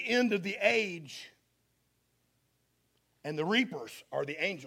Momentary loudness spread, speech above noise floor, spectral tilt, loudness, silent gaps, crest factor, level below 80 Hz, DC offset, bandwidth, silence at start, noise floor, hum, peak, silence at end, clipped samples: 16 LU; 43 dB; -4.5 dB/octave; -31 LUFS; none; 24 dB; -80 dBFS; under 0.1%; 16 kHz; 0 s; -75 dBFS; 60 Hz at -75 dBFS; -12 dBFS; 0 s; under 0.1%